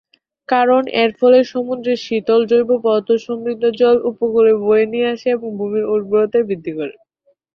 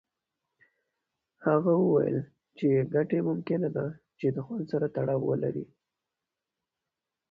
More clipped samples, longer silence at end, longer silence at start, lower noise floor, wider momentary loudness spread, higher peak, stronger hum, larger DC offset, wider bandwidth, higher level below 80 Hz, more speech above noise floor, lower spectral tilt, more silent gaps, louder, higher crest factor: neither; second, 0.65 s vs 1.65 s; second, 0.5 s vs 1.4 s; second, -62 dBFS vs -88 dBFS; second, 8 LU vs 11 LU; first, -2 dBFS vs -14 dBFS; neither; neither; first, 6.6 kHz vs 5.2 kHz; first, -62 dBFS vs -68 dBFS; second, 46 dB vs 61 dB; second, -6 dB/octave vs -11 dB/octave; neither; first, -16 LUFS vs -29 LUFS; about the same, 14 dB vs 16 dB